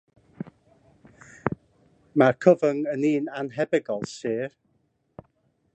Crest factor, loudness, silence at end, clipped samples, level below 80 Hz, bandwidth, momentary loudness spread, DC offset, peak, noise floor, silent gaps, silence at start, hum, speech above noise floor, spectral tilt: 24 dB; -25 LUFS; 1.25 s; under 0.1%; -66 dBFS; 8.8 kHz; 21 LU; under 0.1%; -2 dBFS; -70 dBFS; none; 0.4 s; none; 47 dB; -7 dB/octave